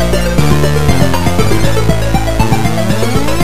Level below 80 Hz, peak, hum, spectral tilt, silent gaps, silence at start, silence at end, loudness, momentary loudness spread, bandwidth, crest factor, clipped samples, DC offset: -20 dBFS; 0 dBFS; none; -5.5 dB/octave; none; 0 s; 0 s; -12 LUFS; 2 LU; 16 kHz; 12 dB; 0.4%; 20%